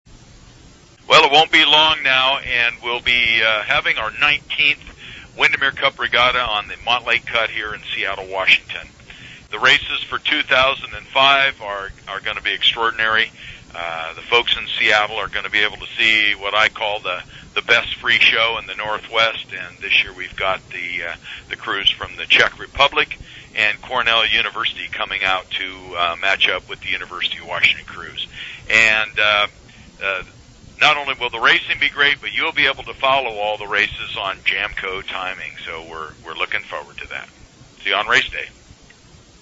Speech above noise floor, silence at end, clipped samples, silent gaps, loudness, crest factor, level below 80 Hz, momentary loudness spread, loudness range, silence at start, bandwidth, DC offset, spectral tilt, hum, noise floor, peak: 28 dB; 0.9 s; under 0.1%; none; -16 LUFS; 20 dB; -46 dBFS; 15 LU; 6 LU; 0.1 s; 8 kHz; under 0.1%; -2 dB/octave; none; -46 dBFS; 0 dBFS